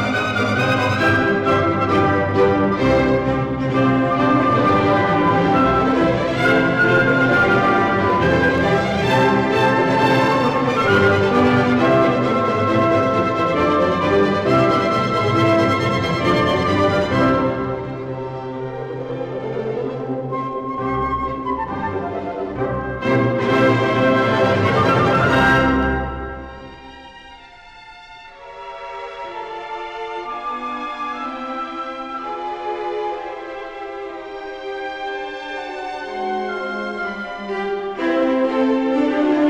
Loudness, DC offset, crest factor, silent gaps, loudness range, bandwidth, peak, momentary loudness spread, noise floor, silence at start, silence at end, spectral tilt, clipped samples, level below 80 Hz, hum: -18 LUFS; under 0.1%; 14 dB; none; 12 LU; 11.5 kHz; -4 dBFS; 14 LU; -42 dBFS; 0 s; 0 s; -6.5 dB/octave; under 0.1%; -40 dBFS; none